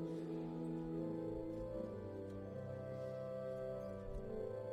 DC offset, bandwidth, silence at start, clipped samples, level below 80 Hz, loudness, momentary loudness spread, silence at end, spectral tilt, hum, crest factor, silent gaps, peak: under 0.1%; 13 kHz; 0 s; under 0.1%; -60 dBFS; -46 LUFS; 5 LU; 0 s; -9 dB/octave; none; 12 dB; none; -32 dBFS